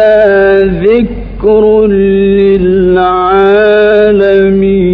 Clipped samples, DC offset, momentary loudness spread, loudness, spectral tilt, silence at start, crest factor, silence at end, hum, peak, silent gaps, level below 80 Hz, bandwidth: 0.8%; under 0.1%; 3 LU; -7 LUFS; -9.5 dB/octave; 0 s; 6 dB; 0 s; none; 0 dBFS; none; -26 dBFS; 5 kHz